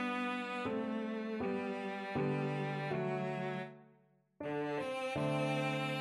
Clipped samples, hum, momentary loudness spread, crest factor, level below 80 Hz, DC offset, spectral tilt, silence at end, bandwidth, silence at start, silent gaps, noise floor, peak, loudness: under 0.1%; none; 5 LU; 14 dB; -74 dBFS; under 0.1%; -6.5 dB/octave; 0 s; 12.5 kHz; 0 s; none; -70 dBFS; -24 dBFS; -38 LUFS